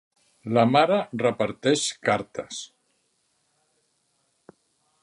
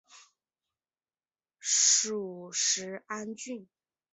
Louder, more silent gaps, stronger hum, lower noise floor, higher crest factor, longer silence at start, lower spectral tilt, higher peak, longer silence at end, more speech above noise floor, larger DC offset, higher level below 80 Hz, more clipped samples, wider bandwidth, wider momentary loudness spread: first, -23 LUFS vs -27 LUFS; neither; neither; second, -71 dBFS vs under -90 dBFS; about the same, 22 dB vs 22 dB; first, 0.45 s vs 0.15 s; first, -4.5 dB/octave vs 0 dB/octave; first, -4 dBFS vs -10 dBFS; first, 2.4 s vs 0.5 s; second, 48 dB vs over 56 dB; neither; first, -68 dBFS vs -86 dBFS; neither; first, 11.5 kHz vs 8.8 kHz; about the same, 17 LU vs 18 LU